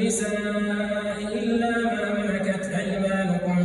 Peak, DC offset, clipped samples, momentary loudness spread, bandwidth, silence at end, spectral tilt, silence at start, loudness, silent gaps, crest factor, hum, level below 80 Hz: -12 dBFS; under 0.1%; under 0.1%; 3 LU; 12.5 kHz; 0 s; -5.5 dB/octave; 0 s; -25 LUFS; none; 12 dB; none; -52 dBFS